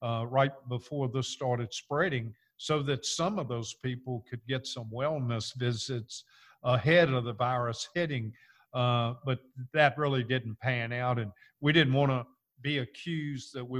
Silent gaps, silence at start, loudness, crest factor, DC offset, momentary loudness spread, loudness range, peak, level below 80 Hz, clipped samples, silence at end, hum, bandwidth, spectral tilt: none; 0 s; -31 LUFS; 22 dB; under 0.1%; 13 LU; 5 LU; -8 dBFS; -64 dBFS; under 0.1%; 0 s; none; 11.5 kHz; -5.5 dB/octave